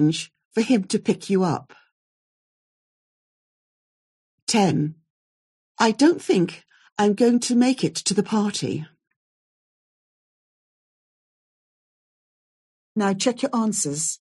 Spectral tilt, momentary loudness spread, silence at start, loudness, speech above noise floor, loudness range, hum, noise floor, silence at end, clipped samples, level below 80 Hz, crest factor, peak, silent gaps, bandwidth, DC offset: -4.5 dB/octave; 11 LU; 0 s; -22 LUFS; over 69 dB; 10 LU; none; under -90 dBFS; 0.05 s; under 0.1%; -70 dBFS; 20 dB; -4 dBFS; 0.45-0.51 s, 1.92-4.47 s, 5.10-5.75 s, 6.92-6.96 s, 9.16-12.95 s; 12 kHz; under 0.1%